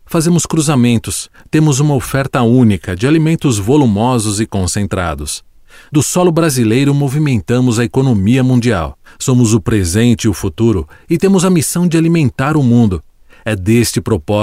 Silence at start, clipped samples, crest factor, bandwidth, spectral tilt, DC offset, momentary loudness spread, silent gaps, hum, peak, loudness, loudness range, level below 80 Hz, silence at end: 0.1 s; under 0.1%; 12 dB; 16 kHz; -6 dB/octave; 0.2%; 7 LU; none; none; 0 dBFS; -13 LUFS; 2 LU; -36 dBFS; 0 s